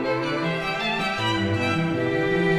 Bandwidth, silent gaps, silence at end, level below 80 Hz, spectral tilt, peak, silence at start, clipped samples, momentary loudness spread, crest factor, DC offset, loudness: 14 kHz; none; 0 s; -50 dBFS; -6 dB/octave; -10 dBFS; 0 s; under 0.1%; 2 LU; 14 dB; under 0.1%; -24 LUFS